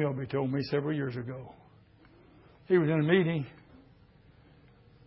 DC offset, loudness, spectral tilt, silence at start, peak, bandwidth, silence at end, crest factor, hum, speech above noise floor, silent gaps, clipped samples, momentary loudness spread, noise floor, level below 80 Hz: under 0.1%; -29 LUFS; -11 dB/octave; 0 s; -12 dBFS; 5.8 kHz; 1.55 s; 20 dB; none; 30 dB; none; under 0.1%; 17 LU; -59 dBFS; -64 dBFS